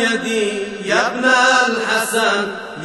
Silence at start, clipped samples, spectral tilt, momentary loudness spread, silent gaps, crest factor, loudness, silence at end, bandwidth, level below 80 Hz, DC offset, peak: 0 s; under 0.1%; -2 dB/octave; 9 LU; none; 14 dB; -16 LUFS; 0 s; 12 kHz; -62 dBFS; 0.1%; -2 dBFS